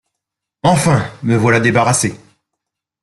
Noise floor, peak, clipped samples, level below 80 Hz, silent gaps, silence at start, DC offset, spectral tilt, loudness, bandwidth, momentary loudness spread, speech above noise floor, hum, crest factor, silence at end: -80 dBFS; -2 dBFS; under 0.1%; -48 dBFS; none; 0.65 s; under 0.1%; -5 dB/octave; -14 LUFS; 12.5 kHz; 6 LU; 67 dB; none; 14 dB; 0.85 s